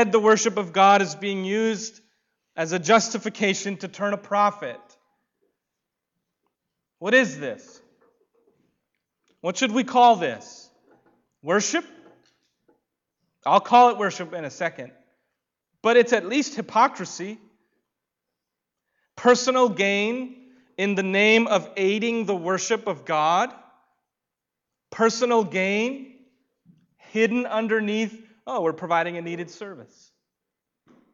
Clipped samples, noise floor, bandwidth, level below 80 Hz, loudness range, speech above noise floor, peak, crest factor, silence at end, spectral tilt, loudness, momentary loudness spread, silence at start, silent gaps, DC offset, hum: under 0.1%; -85 dBFS; 7.8 kHz; -76 dBFS; 6 LU; 64 dB; -6 dBFS; 18 dB; 1.3 s; -3.5 dB/octave; -22 LUFS; 17 LU; 0 s; none; under 0.1%; none